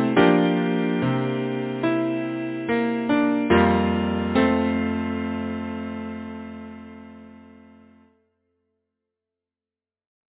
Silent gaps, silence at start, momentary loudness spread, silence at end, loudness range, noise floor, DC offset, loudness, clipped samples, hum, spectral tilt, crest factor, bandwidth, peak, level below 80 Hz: none; 0 s; 18 LU; 2.85 s; 16 LU; under -90 dBFS; under 0.1%; -23 LUFS; under 0.1%; none; -11 dB/octave; 20 dB; 4 kHz; -4 dBFS; -44 dBFS